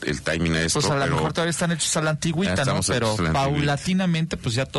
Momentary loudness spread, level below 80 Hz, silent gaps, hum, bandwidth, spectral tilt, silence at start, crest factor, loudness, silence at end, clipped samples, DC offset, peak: 3 LU; -42 dBFS; none; none; 11.5 kHz; -4.5 dB/octave; 0 s; 12 dB; -22 LUFS; 0 s; under 0.1%; under 0.1%; -12 dBFS